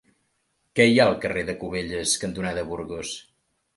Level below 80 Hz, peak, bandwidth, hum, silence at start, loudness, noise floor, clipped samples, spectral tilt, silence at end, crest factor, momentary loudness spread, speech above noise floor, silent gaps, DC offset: -52 dBFS; -4 dBFS; 12 kHz; none; 0.75 s; -24 LUFS; -72 dBFS; under 0.1%; -4 dB/octave; 0.55 s; 22 dB; 15 LU; 48 dB; none; under 0.1%